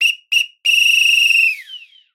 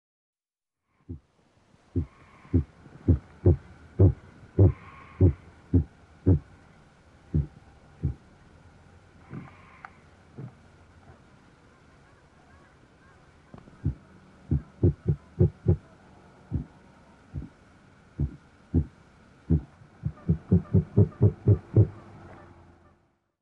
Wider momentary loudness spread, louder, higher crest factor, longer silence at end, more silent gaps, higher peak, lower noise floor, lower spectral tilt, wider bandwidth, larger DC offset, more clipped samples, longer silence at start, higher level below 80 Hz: second, 7 LU vs 23 LU; first, -11 LUFS vs -27 LUFS; second, 12 dB vs 22 dB; second, 0.35 s vs 1.4 s; neither; first, -2 dBFS vs -8 dBFS; second, -38 dBFS vs under -90 dBFS; second, 9 dB/octave vs -11.5 dB/octave; first, 16.5 kHz vs 3 kHz; neither; neither; second, 0 s vs 1.1 s; second, under -90 dBFS vs -40 dBFS